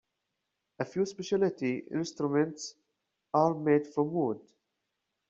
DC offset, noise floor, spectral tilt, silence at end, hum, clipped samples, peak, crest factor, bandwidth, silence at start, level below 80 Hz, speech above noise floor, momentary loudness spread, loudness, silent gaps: under 0.1%; -84 dBFS; -6 dB/octave; 0.9 s; none; under 0.1%; -12 dBFS; 20 dB; 7.8 kHz; 0.8 s; -74 dBFS; 54 dB; 10 LU; -31 LUFS; none